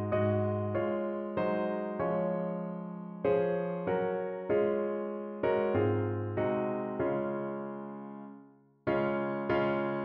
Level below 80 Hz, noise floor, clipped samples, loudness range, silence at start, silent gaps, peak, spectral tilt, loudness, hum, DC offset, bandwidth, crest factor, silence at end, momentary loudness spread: -64 dBFS; -57 dBFS; under 0.1%; 3 LU; 0 s; none; -16 dBFS; -7 dB/octave; -32 LUFS; none; under 0.1%; 5.4 kHz; 16 dB; 0 s; 10 LU